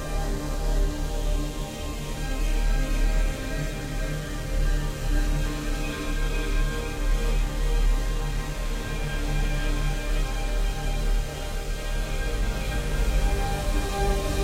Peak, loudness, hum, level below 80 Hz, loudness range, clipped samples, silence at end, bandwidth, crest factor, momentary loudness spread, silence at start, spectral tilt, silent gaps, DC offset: -12 dBFS; -29 LUFS; none; -26 dBFS; 1 LU; under 0.1%; 0 s; 16 kHz; 14 dB; 5 LU; 0 s; -5 dB/octave; none; under 0.1%